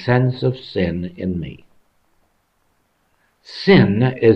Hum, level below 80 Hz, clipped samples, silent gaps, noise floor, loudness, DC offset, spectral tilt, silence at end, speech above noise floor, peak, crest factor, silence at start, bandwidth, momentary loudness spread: none; -46 dBFS; under 0.1%; none; -64 dBFS; -18 LUFS; under 0.1%; -8.5 dB/octave; 0 s; 48 dB; -2 dBFS; 18 dB; 0 s; 6.2 kHz; 15 LU